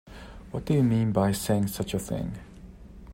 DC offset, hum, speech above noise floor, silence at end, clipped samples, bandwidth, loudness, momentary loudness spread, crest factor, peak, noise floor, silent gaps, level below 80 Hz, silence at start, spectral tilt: under 0.1%; none; 20 dB; 0 s; under 0.1%; 16 kHz; -27 LUFS; 21 LU; 18 dB; -10 dBFS; -46 dBFS; none; -48 dBFS; 0.05 s; -6.5 dB/octave